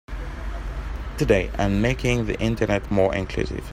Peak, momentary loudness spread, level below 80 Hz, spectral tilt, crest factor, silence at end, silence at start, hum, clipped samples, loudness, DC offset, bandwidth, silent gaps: -4 dBFS; 12 LU; -32 dBFS; -6.5 dB/octave; 20 dB; 0 s; 0.1 s; none; under 0.1%; -24 LUFS; under 0.1%; 16 kHz; none